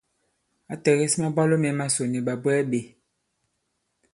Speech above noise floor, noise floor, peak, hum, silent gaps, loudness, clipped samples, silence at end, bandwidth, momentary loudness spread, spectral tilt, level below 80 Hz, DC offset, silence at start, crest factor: 53 dB; -76 dBFS; -6 dBFS; none; none; -24 LUFS; under 0.1%; 1.25 s; 11.5 kHz; 6 LU; -5 dB/octave; -66 dBFS; under 0.1%; 0.7 s; 20 dB